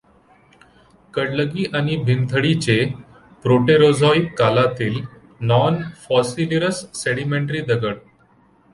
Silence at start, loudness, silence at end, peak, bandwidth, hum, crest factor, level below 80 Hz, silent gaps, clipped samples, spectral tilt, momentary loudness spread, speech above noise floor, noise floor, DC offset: 1.15 s; -19 LUFS; 0.75 s; -2 dBFS; 11.5 kHz; none; 16 dB; -52 dBFS; none; under 0.1%; -6 dB/octave; 12 LU; 37 dB; -55 dBFS; under 0.1%